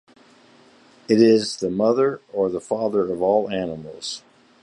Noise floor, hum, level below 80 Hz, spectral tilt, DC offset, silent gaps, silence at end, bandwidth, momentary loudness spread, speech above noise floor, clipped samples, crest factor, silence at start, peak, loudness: -52 dBFS; none; -60 dBFS; -5.5 dB/octave; under 0.1%; none; 0.45 s; 11 kHz; 15 LU; 32 dB; under 0.1%; 18 dB; 1.1 s; -4 dBFS; -21 LUFS